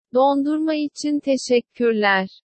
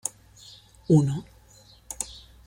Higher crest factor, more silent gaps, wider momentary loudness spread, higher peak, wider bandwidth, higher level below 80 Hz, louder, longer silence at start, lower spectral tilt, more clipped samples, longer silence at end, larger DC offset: second, 14 dB vs 22 dB; neither; second, 6 LU vs 26 LU; about the same, -6 dBFS vs -6 dBFS; second, 8.8 kHz vs 16.5 kHz; second, -72 dBFS vs -54 dBFS; first, -20 LUFS vs -26 LUFS; about the same, 0.15 s vs 0.05 s; second, -4.5 dB/octave vs -6.5 dB/octave; neither; about the same, 0.2 s vs 0.3 s; neither